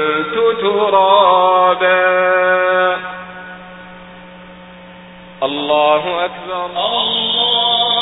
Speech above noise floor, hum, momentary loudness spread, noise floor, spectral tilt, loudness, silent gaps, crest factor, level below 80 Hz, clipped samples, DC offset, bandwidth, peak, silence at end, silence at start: 23 dB; none; 18 LU; -37 dBFS; -8.5 dB/octave; -13 LUFS; none; 14 dB; -54 dBFS; under 0.1%; under 0.1%; 4 kHz; 0 dBFS; 0 s; 0 s